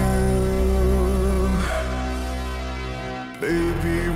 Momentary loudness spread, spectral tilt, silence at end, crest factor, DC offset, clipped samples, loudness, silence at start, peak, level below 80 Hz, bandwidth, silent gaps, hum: 9 LU; -6.5 dB/octave; 0 s; 12 dB; under 0.1%; under 0.1%; -23 LUFS; 0 s; -10 dBFS; -26 dBFS; 15 kHz; none; none